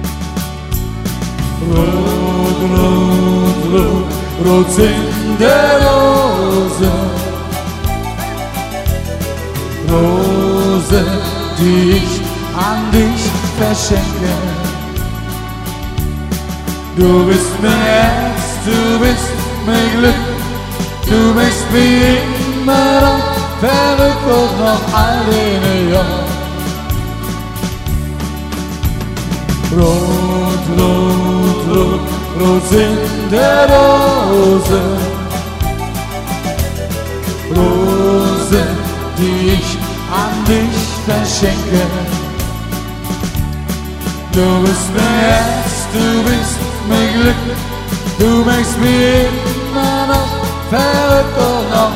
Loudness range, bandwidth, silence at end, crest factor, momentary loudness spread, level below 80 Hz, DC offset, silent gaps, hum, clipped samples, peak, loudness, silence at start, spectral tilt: 6 LU; 16.5 kHz; 0 s; 12 dB; 10 LU; -24 dBFS; under 0.1%; none; none; under 0.1%; 0 dBFS; -13 LUFS; 0 s; -5.5 dB/octave